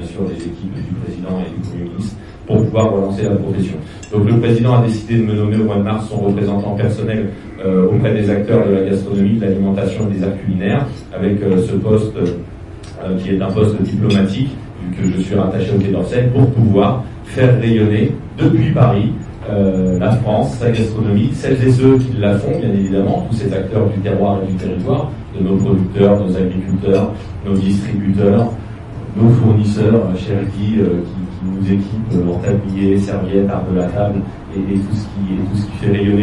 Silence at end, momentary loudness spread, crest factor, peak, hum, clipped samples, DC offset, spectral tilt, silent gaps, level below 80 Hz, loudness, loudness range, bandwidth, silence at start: 0 s; 11 LU; 14 dB; 0 dBFS; none; under 0.1%; under 0.1%; -8.5 dB/octave; none; -36 dBFS; -16 LUFS; 3 LU; 10.5 kHz; 0 s